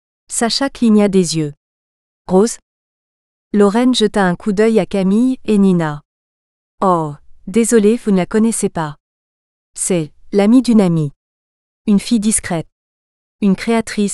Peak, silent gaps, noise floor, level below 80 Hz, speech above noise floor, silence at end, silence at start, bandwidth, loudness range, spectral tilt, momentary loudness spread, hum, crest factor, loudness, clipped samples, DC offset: 0 dBFS; 1.57-2.25 s, 2.62-3.51 s, 6.05-6.78 s, 9.00-9.74 s, 11.16-11.85 s, 12.72-13.39 s; under -90 dBFS; -46 dBFS; over 77 dB; 0 s; 0.3 s; 13 kHz; 2 LU; -5.5 dB/octave; 11 LU; none; 16 dB; -15 LUFS; under 0.1%; under 0.1%